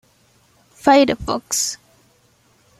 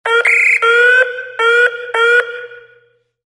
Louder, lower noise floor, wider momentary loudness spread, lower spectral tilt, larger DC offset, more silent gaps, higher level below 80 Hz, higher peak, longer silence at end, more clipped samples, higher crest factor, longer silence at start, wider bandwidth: second, -17 LUFS vs -11 LUFS; about the same, -57 dBFS vs -54 dBFS; about the same, 10 LU vs 8 LU; first, -2.5 dB/octave vs 1.5 dB/octave; neither; neither; first, -48 dBFS vs -74 dBFS; about the same, -2 dBFS vs 0 dBFS; first, 1.05 s vs 0.7 s; neither; first, 20 dB vs 14 dB; first, 0.85 s vs 0.05 s; first, 16 kHz vs 12 kHz